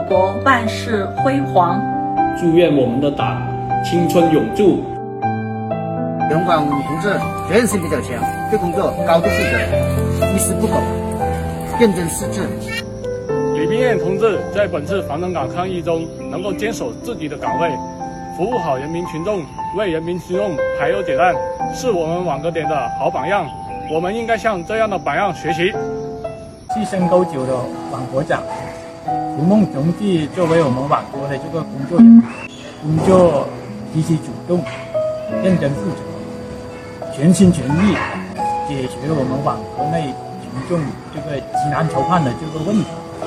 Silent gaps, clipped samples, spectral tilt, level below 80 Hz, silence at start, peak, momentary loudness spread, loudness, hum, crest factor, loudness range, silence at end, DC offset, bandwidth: none; under 0.1%; -6.5 dB/octave; -42 dBFS; 0 s; 0 dBFS; 11 LU; -18 LUFS; none; 18 dB; 7 LU; 0 s; under 0.1%; 16 kHz